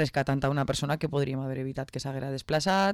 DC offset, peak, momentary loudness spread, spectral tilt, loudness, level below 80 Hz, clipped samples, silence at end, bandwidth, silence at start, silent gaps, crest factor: under 0.1%; -16 dBFS; 8 LU; -5.5 dB/octave; -29 LUFS; -52 dBFS; under 0.1%; 0 s; 14 kHz; 0 s; none; 12 dB